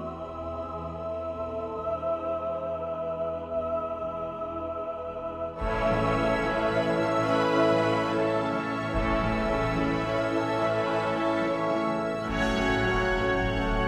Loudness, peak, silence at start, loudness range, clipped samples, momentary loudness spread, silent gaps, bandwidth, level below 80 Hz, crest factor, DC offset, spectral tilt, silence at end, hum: -28 LUFS; -12 dBFS; 0 s; 6 LU; under 0.1%; 9 LU; none; 12.5 kHz; -40 dBFS; 16 dB; under 0.1%; -6.5 dB/octave; 0 s; none